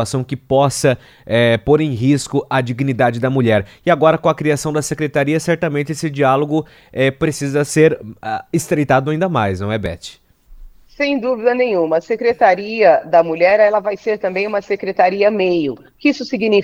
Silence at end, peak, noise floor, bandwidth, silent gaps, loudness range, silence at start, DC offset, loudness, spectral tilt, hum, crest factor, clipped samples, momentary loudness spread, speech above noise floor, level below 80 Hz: 0 s; 0 dBFS; -39 dBFS; 16 kHz; none; 4 LU; 0 s; under 0.1%; -16 LUFS; -6 dB/octave; none; 16 dB; under 0.1%; 8 LU; 24 dB; -48 dBFS